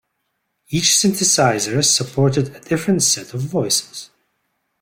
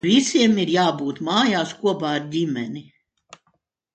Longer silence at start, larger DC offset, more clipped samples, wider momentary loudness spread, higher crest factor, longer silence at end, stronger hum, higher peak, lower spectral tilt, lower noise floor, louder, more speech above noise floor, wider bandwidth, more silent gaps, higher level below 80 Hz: first, 0.7 s vs 0.05 s; neither; neither; about the same, 9 LU vs 10 LU; about the same, 16 dB vs 16 dB; second, 0.75 s vs 1.15 s; neither; about the same, -2 dBFS vs -4 dBFS; second, -3 dB/octave vs -4.5 dB/octave; about the same, -72 dBFS vs -69 dBFS; first, -16 LUFS vs -20 LUFS; first, 55 dB vs 49 dB; first, 16.5 kHz vs 9.2 kHz; neither; first, -56 dBFS vs -64 dBFS